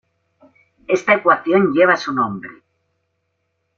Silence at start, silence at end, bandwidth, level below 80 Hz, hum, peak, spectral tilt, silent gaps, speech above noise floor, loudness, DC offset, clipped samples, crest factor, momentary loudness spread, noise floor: 0.9 s; 1.25 s; 7.6 kHz; -64 dBFS; none; 0 dBFS; -6 dB/octave; none; 55 dB; -16 LUFS; under 0.1%; under 0.1%; 20 dB; 11 LU; -71 dBFS